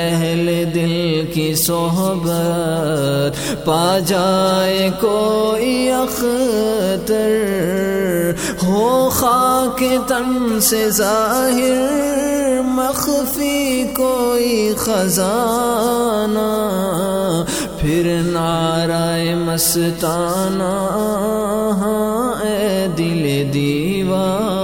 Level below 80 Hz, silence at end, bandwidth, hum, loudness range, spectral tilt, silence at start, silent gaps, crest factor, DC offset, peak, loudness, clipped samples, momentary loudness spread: -40 dBFS; 0 s; over 20 kHz; none; 2 LU; -4.5 dB/octave; 0 s; none; 16 dB; under 0.1%; 0 dBFS; -17 LUFS; under 0.1%; 4 LU